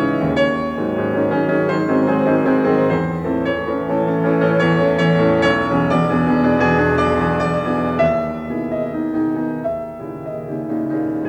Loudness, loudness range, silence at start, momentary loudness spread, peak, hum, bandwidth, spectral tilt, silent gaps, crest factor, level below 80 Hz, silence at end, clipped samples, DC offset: -18 LUFS; 5 LU; 0 s; 8 LU; -4 dBFS; none; 8.8 kHz; -8 dB/octave; none; 14 dB; -46 dBFS; 0 s; under 0.1%; under 0.1%